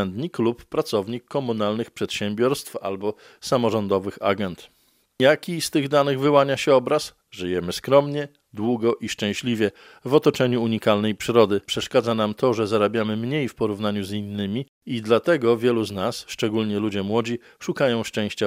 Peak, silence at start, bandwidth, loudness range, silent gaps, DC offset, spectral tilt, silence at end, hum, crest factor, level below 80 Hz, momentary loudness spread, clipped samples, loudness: -2 dBFS; 0 s; 16 kHz; 4 LU; 14.69-14.81 s; under 0.1%; -5.5 dB/octave; 0 s; none; 20 dB; -62 dBFS; 10 LU; under 0.1%; -23 LUFS